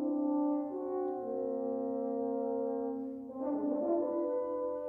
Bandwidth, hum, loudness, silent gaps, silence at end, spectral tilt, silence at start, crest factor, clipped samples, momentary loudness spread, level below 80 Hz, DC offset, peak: 2.2 kHz; none; -35 LUFS; none; 0 s; -10.5 dB/octave; 0 s; 12 dB; under 0.1%; 5 LU; -76 dBFS; under 0.1%; -22 dBFS